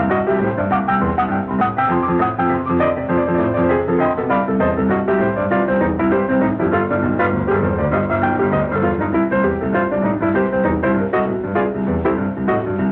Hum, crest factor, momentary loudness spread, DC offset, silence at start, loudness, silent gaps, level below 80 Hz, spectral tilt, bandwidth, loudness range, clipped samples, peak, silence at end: none; 12 dB; 2 LU; under 0.1%; 0 s; -18 LUFS; none; -38 dBFS; -11 dB/octave; 4.2 kHz; 1 LU; under 0.1%; -4 dBFS; 0 s